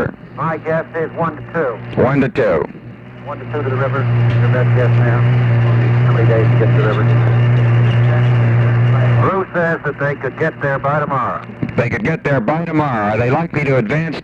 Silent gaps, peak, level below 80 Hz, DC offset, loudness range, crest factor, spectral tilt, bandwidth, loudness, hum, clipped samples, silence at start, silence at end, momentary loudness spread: none; -2 dBFS; -42 dBFS; under 0.1%; 5 LU; 14 dB; -9.5 dB/octave; 4.8 kHz; -15 LUFS; none; under 0.1%; 0 s; 0 s; 9 LU